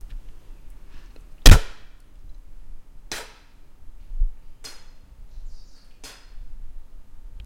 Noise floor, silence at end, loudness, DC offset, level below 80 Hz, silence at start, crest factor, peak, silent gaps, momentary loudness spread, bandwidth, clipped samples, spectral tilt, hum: -45 dBFS; 0.05 s; -21 LUFS; under 0.1%; -24 dBFS; 0.1 s; 22 dB; 0 dBFS; none; 31 LU; 16.5 kHz; 0.3%; -4 dB/octave; none